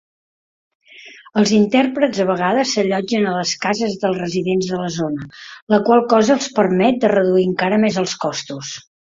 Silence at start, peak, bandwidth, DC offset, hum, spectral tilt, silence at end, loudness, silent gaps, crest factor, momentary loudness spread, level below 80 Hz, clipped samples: 0.95 s; -2 dBFS; 7.8 kHz; under 0.1%; none; -5 dB/octave; 0.4 s; -17 LUFS; 5.62-5.67 s; 16 dB; 11 LU; -58 dBFS; under 0.1%